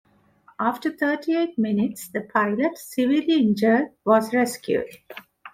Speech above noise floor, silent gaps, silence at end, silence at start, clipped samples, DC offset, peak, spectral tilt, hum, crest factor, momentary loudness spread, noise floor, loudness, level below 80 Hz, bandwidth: 35 dB; none; 0.05 s; 0.6 s; under 0.1%; under 0.1%; -4 dBFS; -5.5 dB/octave; none; 18 dB; 8 LU; -57 dBFS; -23 LUFS; -66 dBFS; 16 kHz